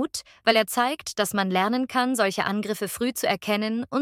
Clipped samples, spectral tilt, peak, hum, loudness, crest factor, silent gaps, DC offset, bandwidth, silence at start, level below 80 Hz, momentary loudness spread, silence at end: under 0.1%; -3.5 dB/octave; -2 dBFS; none; -24 LUFS; 22 dB; none; under 0.1%; 19 kHz; 0 s; -64 dBFS; 6 LU; 0 s